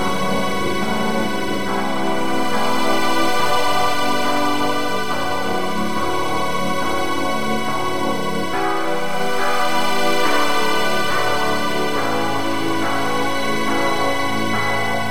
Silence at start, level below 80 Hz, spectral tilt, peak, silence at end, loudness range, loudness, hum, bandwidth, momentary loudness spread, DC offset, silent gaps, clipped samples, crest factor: 0 s; -48 dBFS; -3.5 dB/octave; -4 dBFS; 0 s; 2 LU; -20 LUFS; none; 16 kHz; 4 LU; 9%; none; under 0.1%; 16 dB